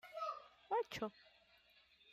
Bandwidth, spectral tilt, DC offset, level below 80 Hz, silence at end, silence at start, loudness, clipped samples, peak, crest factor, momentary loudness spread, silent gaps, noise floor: 15.5 kHz; -4 dB/octave; under 0.1%; -80 dBFS; 0 s; 0.05 s; -45 LUFS; under 0.1%; -30 dBFS; 18 dB; 12 LU; none; -71 dBFS